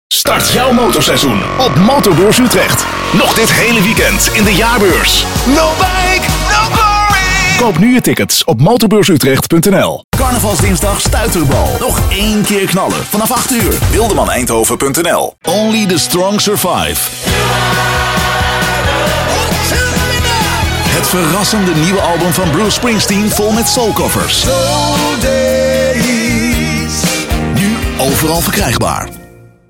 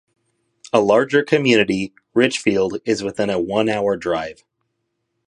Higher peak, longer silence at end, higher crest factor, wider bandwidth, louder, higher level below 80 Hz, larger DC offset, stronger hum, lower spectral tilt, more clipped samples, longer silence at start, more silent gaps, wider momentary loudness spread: about the same, 0 dBFS vs 0 dBFS; second, 0.45 s vs 0.95 s; second, 10 dB vs 20 dB; first, 17 kHz vs 11 kHz; first, -10 LUFS vs -18 LUFS; first, -24 dBFS vs -56 dBFS; neither; neither; about the same, -4 dB/octave vs -5 dB/octave; neither; second, 0.1 s vs 0.75 s; first, 10.04-10.12 s vs none; second, 5 LU vs 8 LU